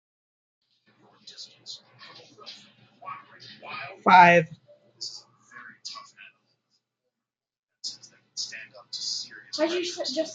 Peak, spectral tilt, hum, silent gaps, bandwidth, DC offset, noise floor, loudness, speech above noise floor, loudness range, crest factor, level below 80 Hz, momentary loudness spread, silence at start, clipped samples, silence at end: -4 dBFS; -3.5 dB/octave; none; 7.59-7.67 s; 9.2 kHz; under 0.1%; -89 dBFS; -23 LUFS; 64 dB; 21 LU; 26 dB; -80 dBFS; 28 LU; 1.25 s; under 0.1%; 0 s